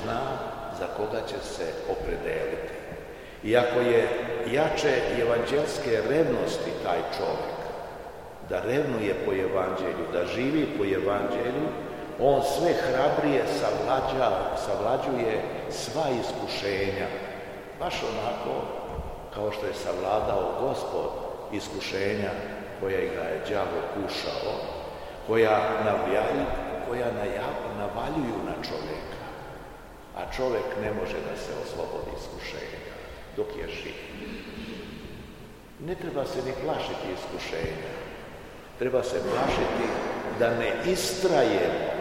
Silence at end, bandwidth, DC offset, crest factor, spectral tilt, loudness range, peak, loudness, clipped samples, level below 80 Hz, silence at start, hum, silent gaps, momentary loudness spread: 0 s; 16 kHz; 0.2%; 22 dB; -5 dB/octave; 8 LU; -6 dBFS; -28 LUFS; under 0.1%; -48 dBFS; 0 s; none; none; 14 LU